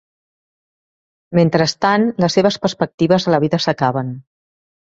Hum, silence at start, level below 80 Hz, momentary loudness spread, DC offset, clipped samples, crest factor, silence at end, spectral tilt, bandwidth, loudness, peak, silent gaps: none; 1.3 s; -56 dBFS; 6 LU; under 0.1%; under 0.1%; 16 dB; 0.65 s; -6 dB/octave; 7.8 kHz; -16 LUFS; -2 dBFS; 2.94-2.98 s